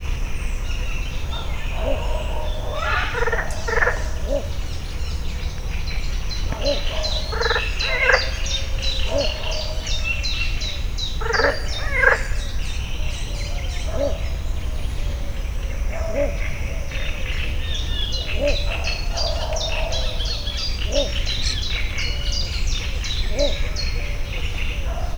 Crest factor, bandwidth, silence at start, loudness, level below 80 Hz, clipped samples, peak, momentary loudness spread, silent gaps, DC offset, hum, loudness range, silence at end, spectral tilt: 20 dB; over 20 kHz; 0 s; -24 LUFS; -24 dBFS; under 0.1%; -2 dBFS; 8 LU; none; under 0.1%; none; 5 LU; 0 s; -3.5 dB/octave